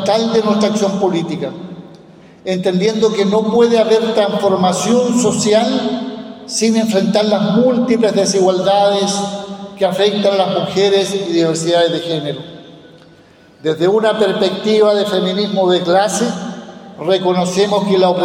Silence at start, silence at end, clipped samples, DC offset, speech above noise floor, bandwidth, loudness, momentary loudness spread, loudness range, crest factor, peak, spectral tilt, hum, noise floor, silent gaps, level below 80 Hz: 0 s; 0 s; under 0.1%; under 0.1%; 31 dB; 15.5 kHz; -14 LUFS; 11 LU; 3 LU; 12 dB; -2 dBFS; -5 dB/octave; none; -45 dBFS; none; -60 dBFS